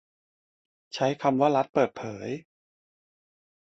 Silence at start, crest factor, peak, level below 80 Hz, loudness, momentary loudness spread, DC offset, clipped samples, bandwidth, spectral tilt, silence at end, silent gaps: 0.95 s; 20 dB; -10 dBFS; -70 dBFS; -27 LUFS; 14 LU; under 0.1%; under 0.1%; 8 kHz; -6 dB/octave; 1.3 s; 1.69-1.73 s